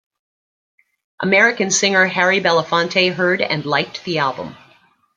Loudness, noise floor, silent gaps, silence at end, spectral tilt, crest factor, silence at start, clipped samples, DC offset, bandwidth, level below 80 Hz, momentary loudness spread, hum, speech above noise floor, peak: -16 LUFS; -54 dBFS; none; 0.6 s; -3 dB/octave; 18 dB; 1.2 s; under 0.1%; under 0.1%; 9.6 kHz; -64 dBFS; 9 LU; none; 38 dB; -2 dBFS